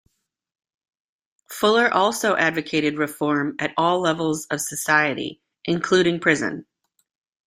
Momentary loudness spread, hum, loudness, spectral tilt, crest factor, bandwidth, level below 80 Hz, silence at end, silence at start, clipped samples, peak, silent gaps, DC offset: 10 LU; none; -21 LUFS; -4 dB/octave; 20 dB; 16 kHz; -64 dBFS; 0.85 s; 1.5 s; under 0.1%; -2 dBFS; none; under 0.1%